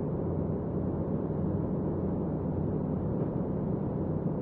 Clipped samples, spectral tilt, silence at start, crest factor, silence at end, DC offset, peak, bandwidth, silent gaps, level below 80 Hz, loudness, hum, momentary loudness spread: under 0.1%; -12.5 dB/octave; 0 s; 12 dB; 0 s; under 0.1%; -20 dBFS; 2.9 kHz; none; -46 dBFS; -32 LUFS; none; 1 LU